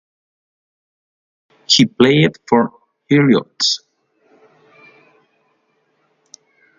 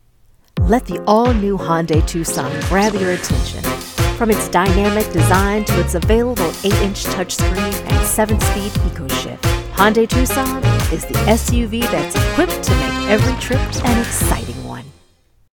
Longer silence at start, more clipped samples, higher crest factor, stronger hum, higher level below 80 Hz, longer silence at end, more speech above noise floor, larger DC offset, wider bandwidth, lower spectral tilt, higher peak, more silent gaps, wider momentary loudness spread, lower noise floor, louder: first, 1.7 s vs 0.55 s; neither; about the same, 20 dB vs 16 dB; neither; second, -60 dBFS vs -24 dBFS; first, 3 s vs 0.7 s; first, 50 dB vs 38 dB; neither; second, 9.4 kHz vs 19 kHz; about the same, -4.5 dB/octave vs -5 dB/octave; about the same, 0 dBFS vs 0 dBFS; neither; about the same, 5 LU vs 6 LU; first, -64 dBFS vs -53 dBFS; about the same, -14 LUFS vs -16 LUFS